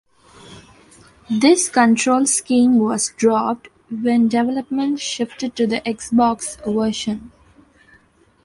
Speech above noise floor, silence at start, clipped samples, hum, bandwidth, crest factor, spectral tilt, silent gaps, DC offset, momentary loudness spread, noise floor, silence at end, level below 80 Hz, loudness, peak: 37 dB; 0.5 s; under 0.1%; none; 11.5 kHz; 18 dB; -3.5 dB/octave; none; under 0.1%; 10 LU; -55 dBFS; 1.15 s; -56 dBFS; -18 LUFS; -2 dBFS